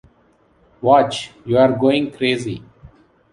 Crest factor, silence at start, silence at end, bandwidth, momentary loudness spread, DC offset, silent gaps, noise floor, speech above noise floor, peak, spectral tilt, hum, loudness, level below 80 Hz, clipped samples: 18 dB; 0.8 s; 0.45 s; 11 kHz; 13 LU; under 0.1%; none; -56 dBFS; 40 dB; -2 dBFS; -6 dB/octave; none; -17 LUFS; -54 dBFS; under 0.1%